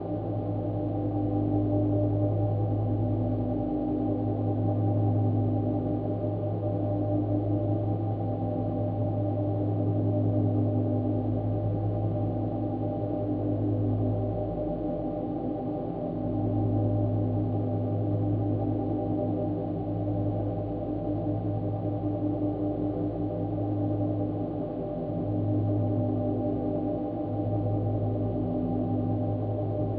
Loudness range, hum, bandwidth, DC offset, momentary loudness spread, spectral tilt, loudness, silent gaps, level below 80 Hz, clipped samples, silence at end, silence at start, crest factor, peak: 2 LU; none; 3.4 kHz; under 0.1%; 5 LU; -12 dB/octave; -29 LUFS; none; -46 dBFS; under 0.1%; 0 s; 0 s; 14 dB; -14 dBFS